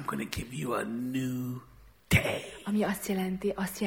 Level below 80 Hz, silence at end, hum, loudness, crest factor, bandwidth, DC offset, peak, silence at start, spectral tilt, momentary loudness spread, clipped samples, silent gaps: -52 dBFS; 0 s; none; -32 LUFS; 22 dB; 18 kHz; under 0.1%; -10 dBFS; 0 s; -5.5 dB/octave; 9 LU; under 0.1%; none